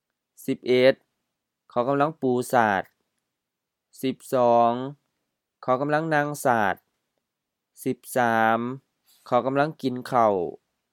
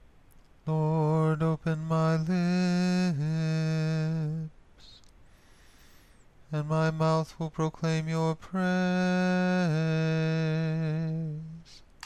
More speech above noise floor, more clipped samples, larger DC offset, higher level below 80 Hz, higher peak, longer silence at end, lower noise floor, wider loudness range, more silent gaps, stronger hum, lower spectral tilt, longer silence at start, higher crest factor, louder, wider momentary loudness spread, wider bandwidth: first, 61 dB vs 29 dB; neither; neither; second, -74 dBFS vs -58 dBFS; first, -4 dBFS vs -16 dBFS; first, 0.4 s vs 0 s; first, -84 dBFS vs -56 dBFS; second, 3 LU vs 6 LU; neither; neither; second, -5.5 dB/octave vs -7.5 dB/octave; second, 0.4 s vs 0.65 s; first, 22 dB vs 14 dB; first, -24 LUFS vs -28 LUFS; first, 14 LU vs 9 LU; first, 18 kHz vs 9.2 kHz